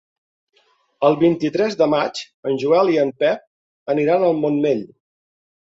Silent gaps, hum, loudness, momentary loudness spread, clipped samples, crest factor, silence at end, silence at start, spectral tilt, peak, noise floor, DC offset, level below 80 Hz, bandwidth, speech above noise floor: 2.34-2.43 s, 3.47-3.86 s; none; -19 LUFS; 9 LU; under 0.1%; 16 dB; 0.8 s; 1 s; -6.5 dB/octave; -2 dBFS; -57 dBFS; under 0.1%; -64 dBFS; 7.8 kHz; 39 dB